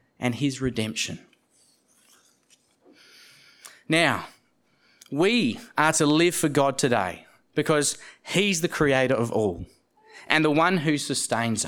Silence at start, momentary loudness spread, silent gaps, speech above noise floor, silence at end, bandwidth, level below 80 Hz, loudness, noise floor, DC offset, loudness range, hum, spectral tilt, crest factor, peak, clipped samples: 0.2 s; 11 LU; none; 42 dB; 0 s; 19 kHz; -58 dBFS; -24 LUFS; -66 dBFS; under 0.1%; 9 LU; none; -4 dB/octave; 24 dB; 0 dBFS; under 0.1%